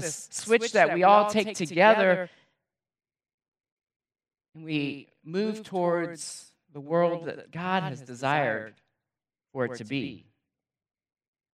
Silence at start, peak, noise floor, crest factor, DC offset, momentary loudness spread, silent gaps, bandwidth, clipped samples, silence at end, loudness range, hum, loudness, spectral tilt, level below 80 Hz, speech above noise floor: 0 s; -6 dBFS; under -90 dBFS; 22 dB; under 0.1%; 19 LU; 3.34-3.38 s, 3.48-3.52 s, 3.72-3.77 s, 3.96-4.00 s; 14 kHz; under 0.1%; 1.35 s; 12 LU; none; -26 LUFS; -4.5 dB/octave; -80 dBFS; over 64 dB